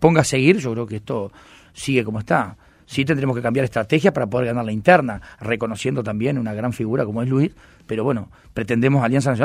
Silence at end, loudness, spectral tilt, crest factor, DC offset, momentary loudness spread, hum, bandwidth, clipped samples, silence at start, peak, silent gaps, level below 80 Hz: 0 s; -20 LUFS; -6.5 dB/octave; 20 dB; under 0.1%; 12 LU; none; 14.5 kHz; under 0.1%; 0 s; 0 dBFS; none; -50 dBFS